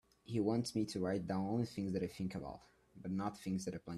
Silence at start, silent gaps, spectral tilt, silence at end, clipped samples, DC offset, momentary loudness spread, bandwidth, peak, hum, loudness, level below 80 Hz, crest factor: 0.3 s; none; -6.5 dB/octave; 0 s; under 0.1%; under 0.1%; 9 LU; 13 kHz; -22 dBFS; none; -40 LUFS; -68 dBFS; 18 dB